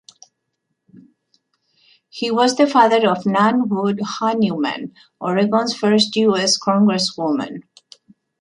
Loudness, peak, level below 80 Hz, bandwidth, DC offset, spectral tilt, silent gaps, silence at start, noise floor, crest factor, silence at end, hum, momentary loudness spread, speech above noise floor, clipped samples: -17 LUFS; -2 dBFS; -64 dBFS; 11 kHz; under 0.1%; -4.5 dB/octave; none; 2.15 s; -75 dBFS; 16 dB; 0.8 s; none; 12 LU; 57 dB; under 0.1%